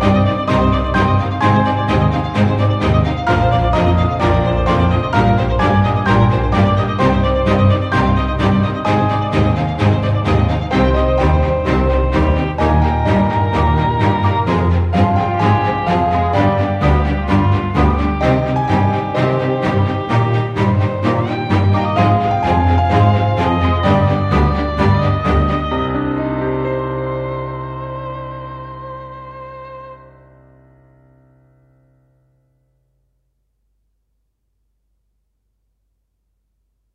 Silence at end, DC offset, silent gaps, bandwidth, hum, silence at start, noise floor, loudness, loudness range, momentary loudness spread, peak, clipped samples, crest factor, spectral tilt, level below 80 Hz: 7 s; under 0.1%; none; 8 kHz; none; 0 s; -67 dBFS; -15 LUFS; 8 LU; 7 LU; 0 dBFS; under 0.1%; 14 dB; -8 dB/octave; -26 dBFS